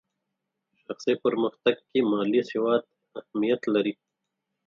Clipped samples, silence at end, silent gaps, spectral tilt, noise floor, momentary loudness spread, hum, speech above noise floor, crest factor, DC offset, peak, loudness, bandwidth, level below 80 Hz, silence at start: under 0.1%; 0.75 s; none; -6 dB/octave; -83 dBFS; 14 LU; none; 58 dB; 20 dB; under 0.1%; -8 dBFS; -26 LUFS; 7.2 kHz; -76 dBFS; 0.9 s